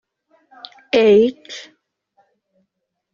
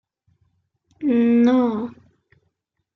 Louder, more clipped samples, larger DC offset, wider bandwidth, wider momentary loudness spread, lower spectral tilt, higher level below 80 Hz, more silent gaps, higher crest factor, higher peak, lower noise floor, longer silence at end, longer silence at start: first, -15 LUFS vs -19 LUFS; neither; neither; first, 7.2 kHz vs 6.2 kHz; first, 27 LU vs 13 LU; second, -3.5 dB/octave vs -8 dB/octave; first, -62 dBFS vs -68 dBFS; neither; about the same, 18 dB vs 16 dB; about the same, -4 dBFS vs -6 dBFS; about the same, -75 dBFS vs -74 dBFS; first, 1.55 s vs 1.05 s; about the same, 0.95 s vs 1 s